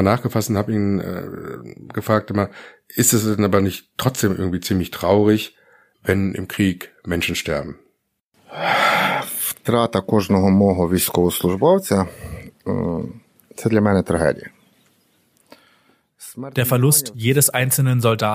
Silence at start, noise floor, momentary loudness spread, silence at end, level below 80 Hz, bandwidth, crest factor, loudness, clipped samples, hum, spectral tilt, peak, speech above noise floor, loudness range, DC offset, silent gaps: 0 s; -67 dBFS; 15 LU; 0 s; -48 dBFS; 15.5 kHz; 20 dB; -19 LUFS; under 0.1%; none; -5 dB/octave; 0 dBFS; 48 dB; 5 LU; under 0.1%; 8.21-8.31 s